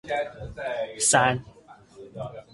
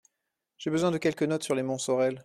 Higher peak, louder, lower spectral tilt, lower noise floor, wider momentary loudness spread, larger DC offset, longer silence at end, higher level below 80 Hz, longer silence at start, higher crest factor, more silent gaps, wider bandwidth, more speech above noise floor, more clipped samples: first, -4 dBFS vs -12 dBFS; first, -24 LUFS vs -29 LUFS; second, -2.5 dB/octave vs -5 dB/octave; second, -50 dBFS vs -84 dBFS; first, 19 LU vs 4 LU; neither; about the same, 0.1 s vs 0.05 s; first, -54 dBFS vs -70 dBFS; second, 0.05 s vs 0.6 s; first, 22 dB vs 16 dB; neither; second, 11.5 kHz vs 14 kHz; second, 25 dB vs 56 dB; neither